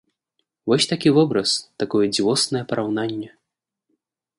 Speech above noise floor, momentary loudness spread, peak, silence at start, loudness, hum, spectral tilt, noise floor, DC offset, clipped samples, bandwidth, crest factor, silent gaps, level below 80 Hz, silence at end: 61 dB; 11 LU; -4 dBFS; 0.65 s; -20 LUFS; none; -4.5 dB/octave; -81 dBFS; under 0.1%; under 0.1%; 11.5 kHz; 18 dB; none; -64 dBFS; 1.1 s